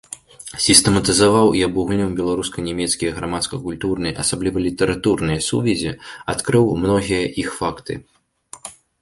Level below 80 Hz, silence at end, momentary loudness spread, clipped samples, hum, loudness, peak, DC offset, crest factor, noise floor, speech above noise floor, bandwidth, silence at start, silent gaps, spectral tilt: -42 dBFS; 0.3 s; 18 LU; under 0.1%; none; -18 LUFS; 0 dBFS; under 0.1%; 20 dB; -40 dBFS; 21 dB; 16 kHz; 0.1 s; none; -4 dB/octave